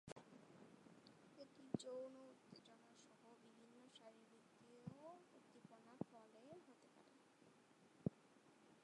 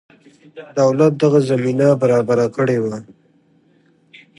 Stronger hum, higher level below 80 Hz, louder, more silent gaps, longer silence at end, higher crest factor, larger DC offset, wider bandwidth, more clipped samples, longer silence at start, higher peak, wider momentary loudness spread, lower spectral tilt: neither; second, -86 dBFS vs -62 dBFS; second, -59 LUFS vs -16 LUFS; first, 0.12-0.16 s vs none; second, 0 s vs 1.35 s; first, 30 dB vs 16 dB; neither; about the same, 11 kHz vs 11.5 kHz; neither; second, 0.05 s vs 0.55 s; second, -28 dBFS vs -2 dBFS; first, 17 LU vs 9 LU; about the same, -6.5 dB/octave vs -7.5 dB/octave